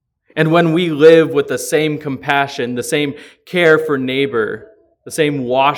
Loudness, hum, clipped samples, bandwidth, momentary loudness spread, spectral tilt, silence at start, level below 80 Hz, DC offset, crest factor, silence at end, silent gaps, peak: -15 LUFS; none; under 0.1%; 18 kHz; 13 LU; -5 dB/octave; 0.35 s; -60 dBFS; under 0.1%; 14 dB; 0 s; none; 0 dBFS